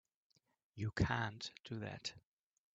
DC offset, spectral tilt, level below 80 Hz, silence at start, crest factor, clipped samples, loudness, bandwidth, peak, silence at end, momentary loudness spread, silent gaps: under 0.1%; -5.5 dB/octave; -60 dBFS; 0.75 s; 24 dB; under 0.1%; -42 LUFS; 8 kHz; -20 dBFS; 0.6 s; 11 LU; none